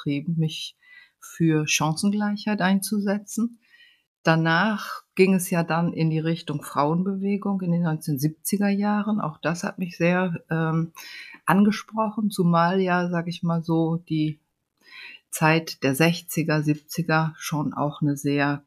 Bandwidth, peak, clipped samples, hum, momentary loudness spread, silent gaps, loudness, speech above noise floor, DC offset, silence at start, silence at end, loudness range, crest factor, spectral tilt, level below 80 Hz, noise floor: 15.5 kHz; -4 dBFS; under 0.1%; none; 9 LU; 4.07-4.24 s; -24 LUFS; 33 dB; under 0.1%; 0 s; 0.05 s; 2 LU; 20 dB; -5.5 dB/octave; -66 dBFS; -56 dBFS